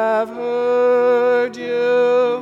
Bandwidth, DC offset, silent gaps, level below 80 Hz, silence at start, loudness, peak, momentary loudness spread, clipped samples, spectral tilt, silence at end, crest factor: 7.2 kHz; under 0.1%; none; -68 dBFS; 0 s; -17 LUFS; -8 dBFS; 6 LU; under 0.1%; -5 dB/octave; 0 s; 8 dB